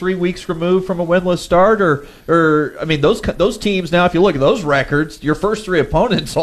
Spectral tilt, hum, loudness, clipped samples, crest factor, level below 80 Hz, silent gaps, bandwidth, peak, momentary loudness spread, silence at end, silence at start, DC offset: -6 dB/octave; none; -15 LUFS; under 0.1%; 12 dB; -36 dBFS; none; 13.5 kHz; -4 dBFS; 6 LU; 0 s; 0 s; under 0.1%